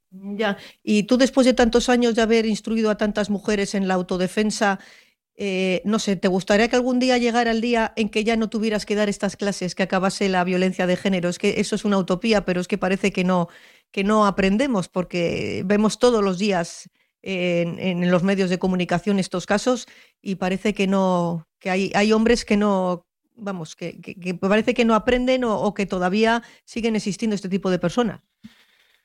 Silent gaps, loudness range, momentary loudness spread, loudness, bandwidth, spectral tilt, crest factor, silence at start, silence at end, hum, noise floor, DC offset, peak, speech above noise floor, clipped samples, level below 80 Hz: none; 3 LU; 9 LU; -21 LUFS; 12 kHz; -5.5 dB/octave; 16 dB; 0.15 s; 0.55 s; none; -59 dBFS; under 0.1%; -4 dBFS; 38 dB; under 0.1%; -48 dBFS